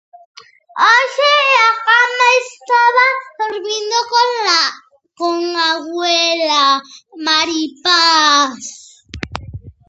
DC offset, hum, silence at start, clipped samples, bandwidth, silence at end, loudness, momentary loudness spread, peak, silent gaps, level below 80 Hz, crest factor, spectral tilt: under 0.1%; none; 0.75 s; under 0.1%; 8.2 kHz; 0.2 s; -13 LUFS; 13 LU; 0 dBFS; none; -48 dBFS; 16 dB; -1.5 dB/octave